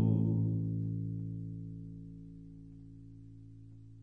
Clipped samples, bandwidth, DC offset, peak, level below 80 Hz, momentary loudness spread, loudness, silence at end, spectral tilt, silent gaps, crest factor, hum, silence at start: under 0.1%; 1.1 kHz; under 0.1%; -20 dBFS; -58 dBFS; 22 LU; -36 LUFS; 0 s; -13 dB/octave; none; 16 dB; none; 0 s